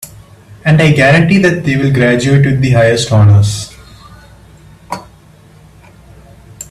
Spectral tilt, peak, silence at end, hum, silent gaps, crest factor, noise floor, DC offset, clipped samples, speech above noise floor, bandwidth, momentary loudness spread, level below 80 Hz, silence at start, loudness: -6 dB/octave; 0 dBFS; 0.1 s; none; none; 12 dB; -41 dBFS; under 0.1%; under 0.1%; 32 dB; 13.5 kHz; 19 LU; -38 dBFS; 0 s; -9 LUFS